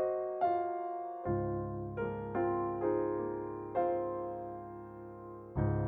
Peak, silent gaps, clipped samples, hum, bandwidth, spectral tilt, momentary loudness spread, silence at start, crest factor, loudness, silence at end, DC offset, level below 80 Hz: -20 dBFS; none; under 0.1%; none; 3.8 kHz; -11.5 dB/octave; 13 LU; 0 s; 16 dB; -36 LUFS; 0 s; under 0.1%; -54 dBFS